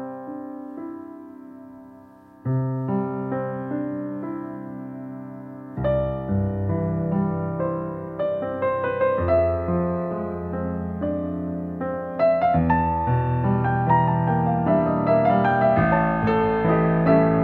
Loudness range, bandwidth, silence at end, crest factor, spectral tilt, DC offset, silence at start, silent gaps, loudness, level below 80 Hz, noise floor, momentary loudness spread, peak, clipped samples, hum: 9 LU; 4.3 kHz; 0 s; 18 dB; -11 dB/octave; under 0.1%; 0 s; none; -23 LUFS; -42 dBFS; -47 dBFS; 16 LU; -6 dBFS; under 0.1%; none